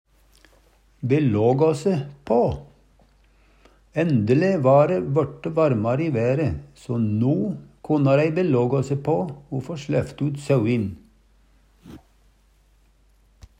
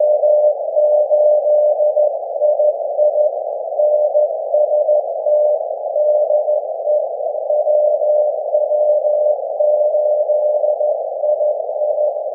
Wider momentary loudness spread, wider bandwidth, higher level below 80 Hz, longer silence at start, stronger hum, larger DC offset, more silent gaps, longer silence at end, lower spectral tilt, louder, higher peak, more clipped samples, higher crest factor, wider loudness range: first, 11 LU vs 5 LU; first, 9.8 kHz vs 0.9 kHz; first, -52 dBFS vs under -90 dBFS; first, 1 s vs 0 s; neither; neither; neither; first, 1.6 s vs 0 s; about the same, -8.5 dB/octave vs -8 dB/octave; second, -22 LUFS vs -16 LUFS; about the same, -4 dBFS vs -4 dBFS; neither; first, 18 dB vs 12 dB; first, 6 LU vs 2 LU